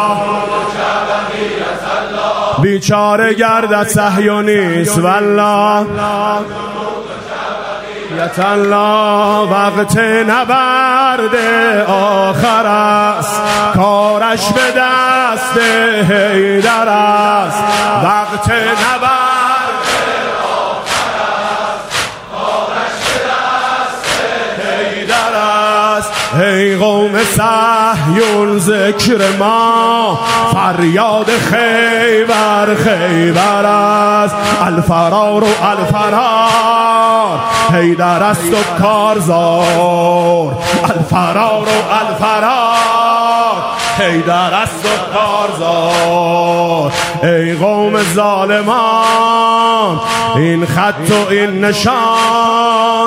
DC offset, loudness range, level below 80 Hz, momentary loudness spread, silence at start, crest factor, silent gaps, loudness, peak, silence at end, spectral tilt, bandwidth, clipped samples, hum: under 0.1%; 4 LU; -44 dBFS; 5 LU; 0 s; 12 dB; none; -11 LUFS; 0 dBFS; 0 s; -4.5 dB/octave; 16 kHz; under 0.1%; none